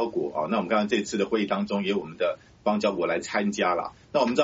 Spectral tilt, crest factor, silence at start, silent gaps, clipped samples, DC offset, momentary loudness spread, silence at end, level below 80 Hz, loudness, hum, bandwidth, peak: -4 dB/octave; 20 dB; 0 s; none; under 0.1%; under 0.1%; 5 LU; 0 s; -62 dBFS; -27 LUFS; none; 8 kHz; -6 dBFS